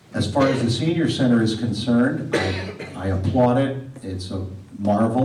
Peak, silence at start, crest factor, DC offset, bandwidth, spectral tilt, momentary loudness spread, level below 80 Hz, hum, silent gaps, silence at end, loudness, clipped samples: -8 dBFS; 0.1 s; 12 dB; under 0.1%; 11.5 kHz; -6.5 dB/octave; 13 LU; -54 dBFS; none; none; 0 s; -21 LUFS; under 0.1%